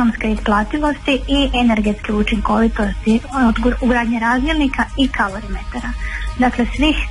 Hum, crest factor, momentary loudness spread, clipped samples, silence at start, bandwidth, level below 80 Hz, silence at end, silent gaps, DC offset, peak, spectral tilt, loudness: none; 12 dB; 9 LU; under 0.1%; 0 s; 11.5 kHz; -26 dBFS; 0 s; none; under 0.1%; -4 dBFS; -5.5 dB/octave; -17 LUFS